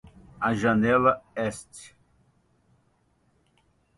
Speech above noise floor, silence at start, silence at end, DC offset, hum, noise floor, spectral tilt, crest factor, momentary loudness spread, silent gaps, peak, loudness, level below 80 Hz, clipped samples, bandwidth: 43 dB; 0.4 s; 2.1 s; under 0.1%; none; -67 dBFS; -6 dB/octave; 22 dB; 22 LU; none; -8 dBFS; -24 LUFS; -56 dBFS; under 0.1%; 11.5 kHz